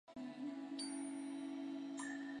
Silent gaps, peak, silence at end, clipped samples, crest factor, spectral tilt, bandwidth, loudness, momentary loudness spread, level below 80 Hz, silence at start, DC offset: none; -34 dBFS; 0 s; under 0.1%; 12 dB; -3 dB/octave; 10.5 kHz; -47 LUFS; 3 LU; under -90 dBFS; 0.05 s; under 0.1%